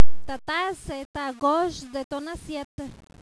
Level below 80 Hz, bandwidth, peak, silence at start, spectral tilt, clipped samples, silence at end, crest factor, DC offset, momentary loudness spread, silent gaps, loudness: -44 dBFS; 11 kHz; -2 dBFS; 0 s; -4.5 dB/octave; under 0.1%; 0 s; 18 dB; under 0.1%; 12 LU; 1.05-1.14 s, 2.04-2.10 s, 2.64-2.78 s; -29 LUFS